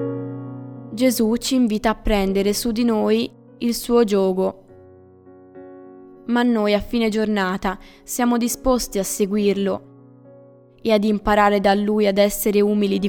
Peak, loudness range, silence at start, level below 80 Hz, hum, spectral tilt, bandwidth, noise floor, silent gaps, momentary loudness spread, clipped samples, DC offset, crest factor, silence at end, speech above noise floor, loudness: -4 dBFS; 3 LU; 0 s; -40 dBFS; none; -5 dB/octave; over 20 kHz; -47 dBFS; none; 11 LU; under 0.1%; under 0.1%; 16 dB; 0 s; 29 dB; -20 LUFS